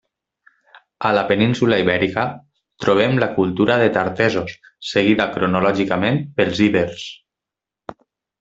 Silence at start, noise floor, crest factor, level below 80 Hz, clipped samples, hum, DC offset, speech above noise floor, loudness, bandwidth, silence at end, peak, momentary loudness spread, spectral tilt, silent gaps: 1 s; -86 dBFS; 18 dB; -54 dBFS; under 0.1%; none; under 0.1%; 69 dB; -18 LUFS; 8 kHz; 0.5 s; 0 dBFS; 15 LU; -6.5 dB/octave; none